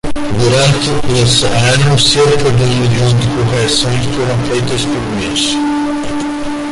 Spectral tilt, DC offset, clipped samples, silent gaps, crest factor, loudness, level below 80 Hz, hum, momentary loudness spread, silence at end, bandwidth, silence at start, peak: -4.5 dB/octave; under 0.1%; under 0.1%; none; 12 dB; -12 LUFS; -30 dBFS; none; 8 LU; 0 s; 11.5 kHz; 0.05 s; 0 dBFS